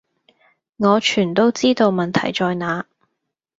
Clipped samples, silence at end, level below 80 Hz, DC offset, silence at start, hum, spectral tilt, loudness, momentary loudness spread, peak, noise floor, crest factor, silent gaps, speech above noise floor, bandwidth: under 0.1%; 0.75 s; -60 dBFS; under 0.1%; 0.8 s; none; -5 dB/octave; -18 LUFS; 8 LU; -2 dBFS; -77 dBFS; 18 dB; none; 60 dB; 8 kHz